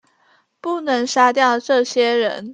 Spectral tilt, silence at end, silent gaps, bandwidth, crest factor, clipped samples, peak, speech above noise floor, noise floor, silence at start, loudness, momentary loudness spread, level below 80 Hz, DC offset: -2.5 dB/octave; 0 s; none; 9.4 kHz; 18 dB; under 0.1%; 0 dBFS; 42 dB; -59 dBFS; 0.65 s; -17 LUFS; 10 LU; -74 dBFS; under 0.1%